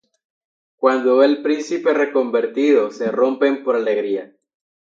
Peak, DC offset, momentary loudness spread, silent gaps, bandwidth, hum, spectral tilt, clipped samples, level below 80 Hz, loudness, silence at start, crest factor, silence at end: -2 dBFS; under 0.1%; 6 LU; none; 7.6 kHz; none; -5 dB/octave; under 0.1%; -78 dBFS; -18 LUFS; 0.8 s; 18 dB; 0.75 s